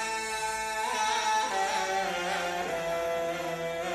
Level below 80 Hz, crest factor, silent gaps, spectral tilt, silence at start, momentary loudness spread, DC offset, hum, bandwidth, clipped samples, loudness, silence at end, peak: -60 dBFS; 14 dB; none; -2 dB/octave; 0 s; 5 LU; under 0.1%; 50 Hz at -60 dBFS; 15.5 kHz; under 0.1%; -30 LUFS; 0 s; -16 dBFS